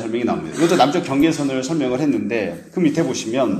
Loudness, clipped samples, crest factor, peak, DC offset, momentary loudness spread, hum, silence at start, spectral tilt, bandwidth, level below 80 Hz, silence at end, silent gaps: -19 LUFS; under 0.1%; 18 dB; 0 dBFS; under 0.1%; 7 LU; none; 0 s; -5.5 dB/octave; 14.5 kHz; -54 dBFS; 0 s; none